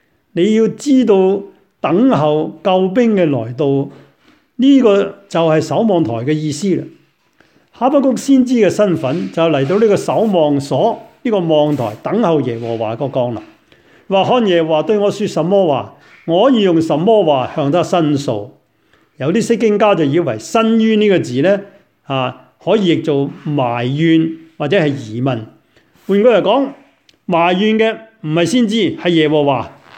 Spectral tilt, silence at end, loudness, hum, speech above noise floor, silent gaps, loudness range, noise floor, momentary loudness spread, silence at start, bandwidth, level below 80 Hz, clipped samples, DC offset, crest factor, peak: -6.5 dB/octave; 0.25 s; -14 LUFS; none; 42 dB; none; 3 LU; -55 dBFS; 9 LU; 0.35 s; 15 kHz; -60 dBFS; under 0.1%; under 0.1%; 14 dB; 0 dBFS